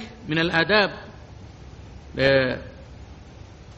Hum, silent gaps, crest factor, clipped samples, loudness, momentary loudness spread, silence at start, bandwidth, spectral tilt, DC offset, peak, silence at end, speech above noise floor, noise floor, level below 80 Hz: none; none; 20 dB; under 0.1%; -21 LUFS; 25 LU; 0 s; 8.4 kHz; -6 dB/octave; under 0.1%; -6 dBFS; 0.05 s; 22 dB; -43 dBFS; -46 dBFS